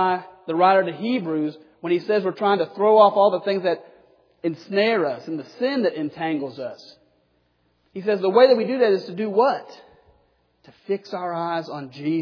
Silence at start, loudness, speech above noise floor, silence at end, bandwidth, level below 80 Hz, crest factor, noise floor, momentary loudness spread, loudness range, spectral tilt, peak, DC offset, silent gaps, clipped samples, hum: 0 s; -21 LUFS; 45 dB; 0 s; 5.4 kHz; -74 dBFS; 20 dB; -66 dBFS; 14 LU; 6 LU; -7.5 dB/octave; -2 dBFS; under 0.1%; none; under 0.1%; none